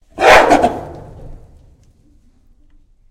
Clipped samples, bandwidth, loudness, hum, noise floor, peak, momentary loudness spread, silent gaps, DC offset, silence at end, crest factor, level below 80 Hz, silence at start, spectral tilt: 0.4%; 17 kHz; -10 LUFS; none; -50 dBFS; 0 dBFS; 26 LU; none; under 0.1%; 1.75 s; 16 dB; -36 dBFS; 0.15 s; -3.5 dB/octave